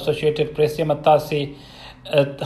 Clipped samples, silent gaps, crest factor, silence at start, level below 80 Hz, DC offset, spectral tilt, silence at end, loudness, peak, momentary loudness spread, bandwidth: under 0.1%; none; 18 dB; 0 s; -48 dBFS; under 0.1%; -6.5 dB/octave; 0 s; -20 LUFS; -2 dBFS; 21 LU; 13.5 kHz